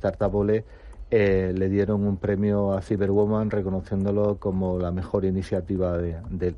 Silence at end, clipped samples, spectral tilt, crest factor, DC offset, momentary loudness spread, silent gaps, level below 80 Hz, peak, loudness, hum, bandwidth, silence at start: 0 s; under 0.1%; -9.5 dB/octave; 16 dB; under 0.1%; 5 LU; none; -42 dBFS; -8 dBFS; -25 LUFS; none; 9.4 kHz; 0 s